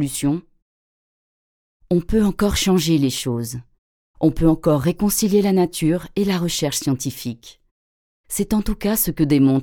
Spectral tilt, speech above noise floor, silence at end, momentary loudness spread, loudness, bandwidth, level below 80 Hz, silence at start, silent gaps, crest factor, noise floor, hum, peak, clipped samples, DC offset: -5.5 dB/octave; over 71 dB; 0 s; 10 LU; -19 LUFS; 19.5 kHz; -36 dBFS; 0 s; 0.62-1.80 s, 3.78-4.14 s, 7.71-8.24 s; 16 dB; under -90 dBFS; none; -4 dBFS; under 0.1%; under 0.1%